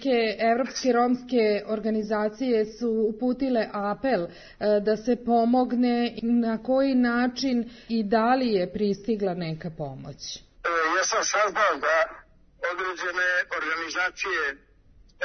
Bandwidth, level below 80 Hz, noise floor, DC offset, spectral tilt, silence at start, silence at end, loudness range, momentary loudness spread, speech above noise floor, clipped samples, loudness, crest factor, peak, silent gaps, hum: 6.6 kHz; -56 dBFS; -55 dBFS; under 0.1%; -4 dB/octave; 0 s; 0 s; 3 LU; 9 LU; 30 dB; under 0.1%; -25 LUFS; 16 dB; -8 dBFS; none; none